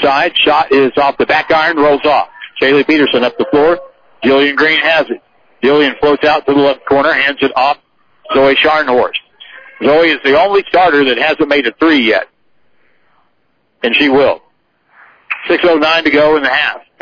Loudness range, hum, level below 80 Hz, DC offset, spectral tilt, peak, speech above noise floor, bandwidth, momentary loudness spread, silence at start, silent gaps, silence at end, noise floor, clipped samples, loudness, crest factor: 3 LU; none; -46 dBFS; under 0.1%; -5.5 dB/octave; 0 dBFS; 50 dB; 5.4 kHz; 7 LU; 0 s; none; 0.25 s; -61 dBFS; under 0.1%; -11 LUFS; 12 dB